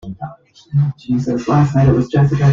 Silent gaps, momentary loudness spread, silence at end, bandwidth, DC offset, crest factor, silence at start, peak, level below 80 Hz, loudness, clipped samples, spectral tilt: none; 17 LU; 0 s; 7.2 kHz; under 0.1%; 14 dB; 0.05 s; -2 dBFS; -38 dBFS; -15 LUFS; under 0.1%; -9 dB/octave